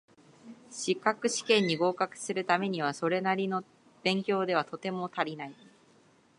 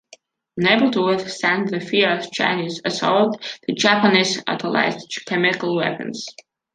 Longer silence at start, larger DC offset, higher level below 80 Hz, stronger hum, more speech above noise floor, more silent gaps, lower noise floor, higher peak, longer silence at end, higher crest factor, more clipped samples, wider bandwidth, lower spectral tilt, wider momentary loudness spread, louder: about the same, 0.45 s vs 0.55 s; neither; second, -82 dBFS vs -66 dBFS; neither; about the same, 33 dB vs 31 dB; neither; first, -63 dBFS vs -51 dBFS; second, -10 dBFS vs -2 dBFS; first, 0.85 s vs 0.45 s; about the same, 22 dB vs 18 dB; neither; first, 11.5 kHz vs 9.8 kHz; about the same, -4 dB/octave vs -4 dB/octave; about the same, 10 LU vs 12 LU; second, -30 LUFS vs -19 LUFS